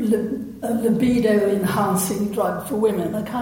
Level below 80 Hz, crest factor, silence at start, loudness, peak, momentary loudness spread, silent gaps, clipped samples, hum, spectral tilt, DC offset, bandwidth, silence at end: -50 dBFS; 14 dB; 0 s; -21 LUFS; -6 dBFS; 7 LU; none; under 0.1%; none; -6 dB/octave; under 0.1%; 17 kHz; 0 s